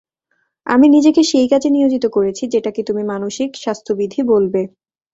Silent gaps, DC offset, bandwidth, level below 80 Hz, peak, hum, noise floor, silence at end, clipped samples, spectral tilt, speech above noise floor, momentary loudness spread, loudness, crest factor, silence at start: none; under 0.1%; 8 kHz; -56 dBFS; -2 dBFS; none; -67 dBFS; 0.45 s; under 0.1%; -5 dB/octave; 52 dB; 11 LU; -15 LUFS; 14 dB; 0.65 s